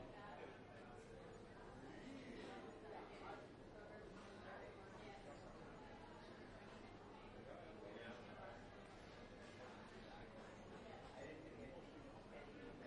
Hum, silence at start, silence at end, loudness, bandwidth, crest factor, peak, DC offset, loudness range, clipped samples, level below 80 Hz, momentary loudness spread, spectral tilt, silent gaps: none; 0 s; 0 s; -58 LUFS; 10.5 kHz; 14 dB; -44 dBFS; under 0.1%; 1 LU; under 0.1%; -70 dBFS; 4 LU; -5.5 dB/octave; none